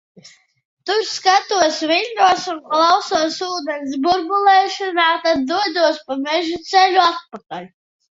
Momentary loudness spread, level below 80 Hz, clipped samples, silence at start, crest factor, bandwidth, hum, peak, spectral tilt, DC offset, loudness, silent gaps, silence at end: 10 LU; -62 dBFS; under 0.1%; 0.25 s; 18 dB; 7.8 kHz; none; 0 dBFS; -2 dB/octave; under 0.1%; -17 LUFS; 0.65-0.77 s; 0.5 s